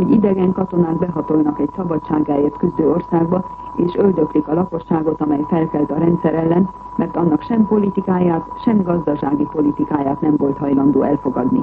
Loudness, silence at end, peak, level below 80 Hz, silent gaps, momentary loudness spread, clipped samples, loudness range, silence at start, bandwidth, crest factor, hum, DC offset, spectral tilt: -17 LUFS; 0 s; -2 dBFS; -44 dBFS; none; 5 LU; under 0.1%; 1 LU; 0 s; 4.5 kHz; 14 dB; none; under 0.1%; -11.5 dB/octave